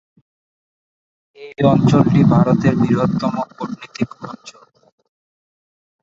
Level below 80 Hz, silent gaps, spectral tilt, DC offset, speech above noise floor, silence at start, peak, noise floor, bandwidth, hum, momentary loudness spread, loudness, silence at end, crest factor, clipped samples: -48 dBFS; none; -8.5 dB/octave; under 0.1%; over 74 dB; 1.4 s; 0 dBFS; under -90 dBFS; 7.6 kHz; none; 20 LU; -16 LUFS; 1.5 s; 18 dB; under 0.1%